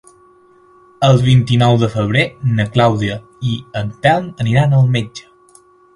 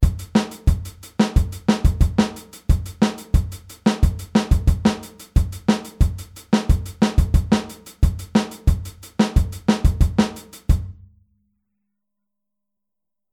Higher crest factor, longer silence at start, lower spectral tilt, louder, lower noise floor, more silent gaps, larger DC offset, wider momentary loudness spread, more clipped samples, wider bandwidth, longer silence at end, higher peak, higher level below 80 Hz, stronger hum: about the same, 16 dB vs 18 dB; first, 1 s vs 0 s; about the same, -7 dB/octave vs -6.5 dB/octave; first, -15 LUFS vs -21 LUFS; second, -48 dBFS vs -87 dBFS; neither; neither; first, 11 LU vs 7 LU; neither; second, 11 kHz vs 16 kHz; second, 0.75 s vs 2.4 s; about the same, 0 dBFS vs -2 dBFS; second, -44 dBFS vs -24 dBFS; neither